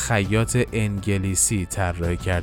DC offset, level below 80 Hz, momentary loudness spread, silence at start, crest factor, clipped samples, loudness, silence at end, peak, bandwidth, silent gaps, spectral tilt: under 0.1%; -36 dBFS; 5 LU; 0 s; 16 dB; under 0.1%; -22 LUFS; 0 s; -6 dBFS; 17.5 kHz; none; -4.5 dB/octave